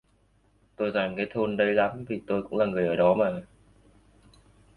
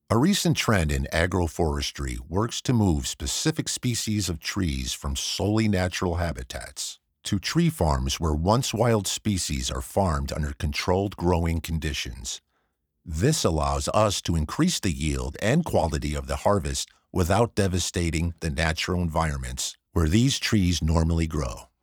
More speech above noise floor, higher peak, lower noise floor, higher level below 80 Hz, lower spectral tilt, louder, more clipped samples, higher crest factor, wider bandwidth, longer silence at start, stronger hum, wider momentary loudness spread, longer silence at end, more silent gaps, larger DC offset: second, 39 dB vs 49 dB; second, -8 dBFS vs -4 dBFS; second, -65 dBFS vs -74 dBFS; second, -60 dBFS vs -36 dBFS; first, -8 dB/octave vs -5 dB/octave; about the same, -26 LUFS vs -25 LUFS; neither; about the same, 20 dB vs 20 dB; second, 4.7 kHz vs over 20 kHz; first, 0.8 s vs 0.1 s; neither; about the same, 8 LU vs 8 LU; first, 1.3 s vs 0.2 s; neither; neither